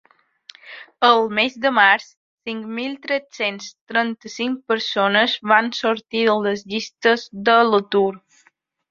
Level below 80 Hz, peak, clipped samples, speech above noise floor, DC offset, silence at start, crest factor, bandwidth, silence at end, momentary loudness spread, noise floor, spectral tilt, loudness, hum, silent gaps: -68 dBFS; -2 dBFS; under 0.1%; 42 dB; under 0.1%; 0.65 s; 20 dB; 7.4 kHz; 0.75 s; 12 LU; -61 dBFS; -4 dB/octave; -19 LUFS; none; 2.17-2.37 s, 3.81-3.87 s